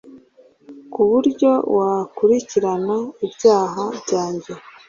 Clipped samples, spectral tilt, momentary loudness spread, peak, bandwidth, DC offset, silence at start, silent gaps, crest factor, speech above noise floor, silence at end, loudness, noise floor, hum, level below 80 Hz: under 0.1%; -6 dB/octave; 11 LU; -2 dBFS; 7.4 kHz; under 0.1%; 0.05 s; none; 16 dB; 33 dB; 0.3 s; -19 LUFS; -51 dBFS; none; -62 dBFS